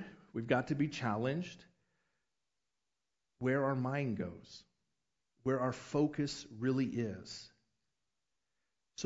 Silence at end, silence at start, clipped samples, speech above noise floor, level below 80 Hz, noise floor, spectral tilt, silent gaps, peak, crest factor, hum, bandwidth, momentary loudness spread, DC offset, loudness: 0 s; 0 s; under 0.1%; 54 dB; -70 dBFS; -90 dBFS; -6 dB/octave; none; -16 dBFS; 22 dB; none; 7.6 kHz; 15 LU; under 0.1%; -37 LUFS